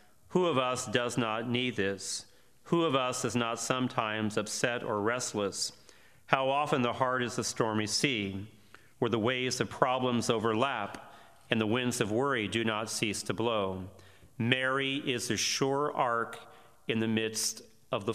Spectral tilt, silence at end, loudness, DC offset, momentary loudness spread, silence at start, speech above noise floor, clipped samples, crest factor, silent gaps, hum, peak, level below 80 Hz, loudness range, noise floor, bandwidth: -4 dB/octave; 0 s; -31 LUFS; under 0.1%; 8 LU; 0.3 s; 28 dB; under 0.1%; 26 dB; none; none; -4 dBFS; -72 dBFS; 1 LU; -58 dBFS; 15.5 kHz